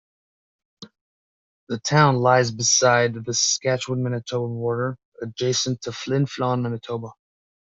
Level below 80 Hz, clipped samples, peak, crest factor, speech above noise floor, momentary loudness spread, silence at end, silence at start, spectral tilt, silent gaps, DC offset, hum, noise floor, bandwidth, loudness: -62 dBFS; under 0.1%; -4 dBFS; 20 dB; over 68 dB; 14 LU; 0.65 s; 0.8 s; -3.5 dB/octave; 1.01-1.67 s, 5.05-5.12 s; under 0.1%; none; under -90 dBFS; 7.8 kHz; -21 LUFS